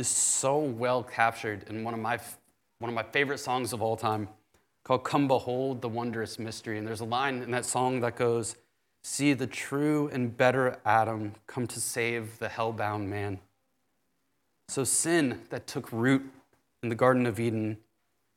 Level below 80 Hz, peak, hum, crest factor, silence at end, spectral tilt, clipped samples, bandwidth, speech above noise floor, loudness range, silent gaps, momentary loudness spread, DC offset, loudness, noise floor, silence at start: -72 dBFS; -8 dBFS; none; 22 dB; 0.6 s; -4 dB/octave; under 0.1%; 17 kHz; 48 dB; 4 LU; none; 12 LU; under 0.1%; -29 LUFS; -77 dBFS; 0 s